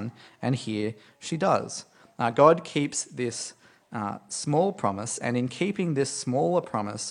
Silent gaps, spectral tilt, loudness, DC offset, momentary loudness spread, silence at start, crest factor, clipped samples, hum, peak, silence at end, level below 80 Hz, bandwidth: none; -5 dB/octave; -27 LUFS; under 0.1%; 14 LU; 0 s; 22 dB; under 0.1%; none; -4 dBFS; 0 s; -70 dBFS; 11 kHz